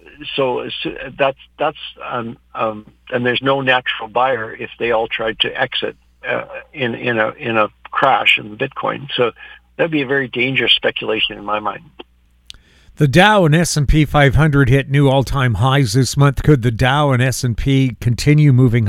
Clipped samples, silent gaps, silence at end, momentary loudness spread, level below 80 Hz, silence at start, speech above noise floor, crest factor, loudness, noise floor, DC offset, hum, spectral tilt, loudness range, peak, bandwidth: under 0.1%; none; 0 s; 12 LU; -32 dBFS; 0.2 s; 28 dB; 16 dB; -16 LUFS; -43 dBFS; under 0.1%; none; -5.5 dB/octave; 6 LU; 0 dBFS; 14 kHz